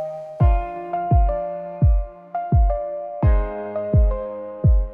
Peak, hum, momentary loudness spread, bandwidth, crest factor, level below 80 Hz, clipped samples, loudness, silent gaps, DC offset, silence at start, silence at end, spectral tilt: -6 dBFS; none; 9 LU; 3.1 kHz; 12 dB; -22 dBFS; under 0.1%; -22 LUFS; none; under 0.1%; 0 s; 0 s; -12 dB/octave